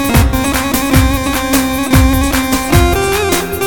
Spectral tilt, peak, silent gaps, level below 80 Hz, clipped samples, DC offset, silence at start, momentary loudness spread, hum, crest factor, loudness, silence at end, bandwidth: -4.5 dB/octave; 0 dBFS; none; -18 dBFS; under 0.1%; 2%; 0 s; 3 LU; none; 12 dB; -12 LUFS; 0 s; 19.5 kHz